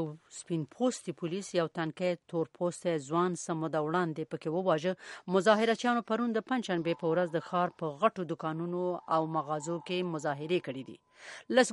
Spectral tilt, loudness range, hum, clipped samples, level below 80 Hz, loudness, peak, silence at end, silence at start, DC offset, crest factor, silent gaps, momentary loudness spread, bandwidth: -5.5 dB/octave; 3 LU; none; under 0.1%; -80 dBFS; -32 LUFS; -10 dBFS; 0 s; 0 s; under 0.1%; 22 dB; none; 9 LU; 11.5 kHz